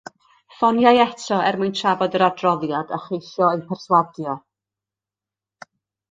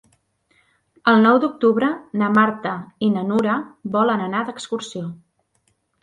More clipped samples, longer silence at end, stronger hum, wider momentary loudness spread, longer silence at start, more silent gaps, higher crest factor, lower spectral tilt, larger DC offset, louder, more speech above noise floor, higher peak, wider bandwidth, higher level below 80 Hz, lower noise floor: neither; first, 1.75 s vs 0.9 s; neither; about the same, 13 LU vs 13 LU; second, 0.6 s vs 1.05 s; neither; about the same, 20 dB vs 18 dB; about the same, -5.5 dB/octave vs -6.5 dB/octave; neither; about the same, -20 LUFS vs -19 LUFS; first, 70 dB vs 48 dB; about the same, -2 dBFS vs -2 dBFS; about the same, 9.2 kHz vs 9.4 kHz; about the same, -66 dBFS vs -64 dBFS; first, -89 dBFS vs -67 dBFS